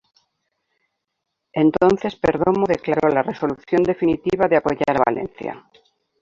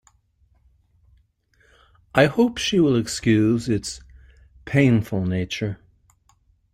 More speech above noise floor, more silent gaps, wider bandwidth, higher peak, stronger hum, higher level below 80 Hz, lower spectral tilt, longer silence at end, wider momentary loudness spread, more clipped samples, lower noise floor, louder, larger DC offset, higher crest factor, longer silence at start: first, 60 dB vs 42 dB; neither; second, 7.6 kHz vs 15.5 kHz; about the same, -2 dBFS vs -4 dBFS; neither; about the same, -50 dBFS vs -50 dBFS; first, -7.5 dB/octave vs -6 dB/octave; second, 0.6 s vs 1 s; about the same, 11 LU vs 11 LU; neither; first, -78 dBFS vs -62 dBFS; about the same, -19 LUFS vs -21 LUFS; neither; about the same, 18 dB vs 20 dB; second, 1.55 s vs 2.15 s